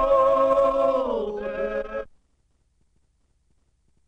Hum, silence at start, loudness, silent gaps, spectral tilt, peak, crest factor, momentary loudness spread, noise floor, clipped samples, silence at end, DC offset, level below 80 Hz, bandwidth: none; 0 s; -22 LUFS; none; -6 dB/octave; -10 dBFS; 16 dB; 12 LU; -67 dBFS; under 0.1%; 2.05 s; under 0.1%; -48 dBFS; 7.2 kHz